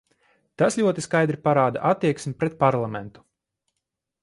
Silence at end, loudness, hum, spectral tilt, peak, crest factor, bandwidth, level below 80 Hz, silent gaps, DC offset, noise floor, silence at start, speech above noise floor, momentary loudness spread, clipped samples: 1.15 s; -23 LUFS; none; -6 dB/octave; -4 dBFS; 20 dB; 11.5 kHz; -62 dBFS; none; under 0.1%; -82 dBFS; 0.6 s; 60 dB; 8 LU; under 0.1%